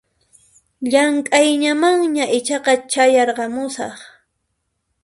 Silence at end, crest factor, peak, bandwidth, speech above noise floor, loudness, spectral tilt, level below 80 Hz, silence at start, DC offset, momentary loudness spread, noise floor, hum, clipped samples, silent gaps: 0.95 s; 18 dB; 0 dBFS; 11.5 kHz; 56 dB; -16 LUFS; -2 dB/octave; -64 dBFS; 0.8 s; under 0.1%; 11 LU; -72 dBFS; none; under 0.1%; none